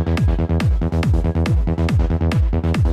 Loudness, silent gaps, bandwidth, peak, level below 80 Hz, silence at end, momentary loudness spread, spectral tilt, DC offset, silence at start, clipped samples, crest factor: -19 LUFS; none; 10.5 kHz; -10 dBFS; -20 dBFS; 0 s; 1 LU; -8 dB/octave; under 0.1%; 0 s; under 0.1%; 8 dB